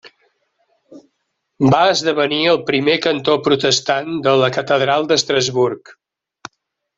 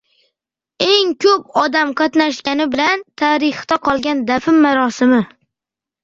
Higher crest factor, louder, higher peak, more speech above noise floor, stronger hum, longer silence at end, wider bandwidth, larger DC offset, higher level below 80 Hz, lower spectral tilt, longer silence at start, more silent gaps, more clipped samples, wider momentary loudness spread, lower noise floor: about the same, 16 dB vs 16 dB; about the same, -16 LUFS vs -15 LUFS; about the same, 0 dBFS vs 0 dBFS; second, 56 dB vs 72 dB; neither; first, 1.05 s vs 0.75 s; about the same, 7.8 kHz vs 7.6 kHz; neither; about the same, -56 dBFS vs -56 dBFS; about the same, -4 dB/octave vs -4 dB/octave; second, 0.05 s vs 0.8 s; neither; neither; about the same, 5 LU vs 5 LU; second, -72 dBFS vs -87 dBFS